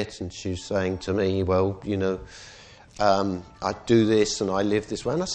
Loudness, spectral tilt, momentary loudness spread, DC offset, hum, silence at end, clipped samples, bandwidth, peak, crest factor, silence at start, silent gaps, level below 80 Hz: -25 LUFS; -5.5 dB/octave; 11 LU; under 0.1%; none; 0 s; under 0.1%; 9.4 kHz; -6 dBFS; 18 dB; 0 s; none; -50 dBFS